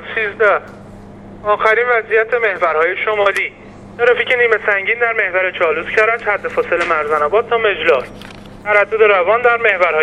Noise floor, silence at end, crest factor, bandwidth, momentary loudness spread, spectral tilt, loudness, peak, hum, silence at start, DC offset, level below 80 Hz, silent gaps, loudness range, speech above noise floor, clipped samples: -35 dBFS; 0 s; 16 dB; 11.5 kHz; 7 LU; -4 dB/octave; -14 LUFS; 0 dBFS; none; 0 s; under 0.1%; -48 dBFS; none; 2 LU; 21 dB; under 0.1%